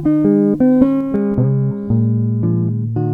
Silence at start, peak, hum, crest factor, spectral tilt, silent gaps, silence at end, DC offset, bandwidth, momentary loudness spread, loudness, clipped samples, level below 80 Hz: 0 s; 0 dBFS; none; 14 dB; -12.5 dB/octave; none; 0 s; under 0.1%; 3.2 kHz; 6 LU; -15 LUFS; under 0.1%; -42 dBFS